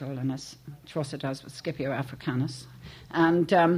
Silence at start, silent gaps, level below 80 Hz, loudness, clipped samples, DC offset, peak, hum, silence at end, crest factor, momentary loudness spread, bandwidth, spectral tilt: 0 s; none; -60 dBFS; -29 LUFS; under 0.1%; under 0.1%; -10 dBFS; none; 0 s; 18 dB; 20 LU; 15 kHz; -6.5 dB/octave